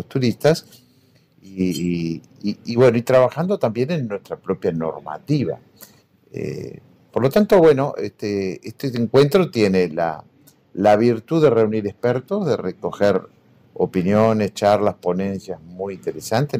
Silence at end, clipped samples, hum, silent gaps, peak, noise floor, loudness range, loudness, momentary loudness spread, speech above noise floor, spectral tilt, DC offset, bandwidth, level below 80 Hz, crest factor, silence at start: 0 s; under 0.1%; none; none; -6 dBFS; -56 dBFS; 5 LU; -20 LUFS; 14 LU; 37 dB; -7 dB/octave; under 0.1%; 16 kHz; -56 dBFS; 14 dB; 0 s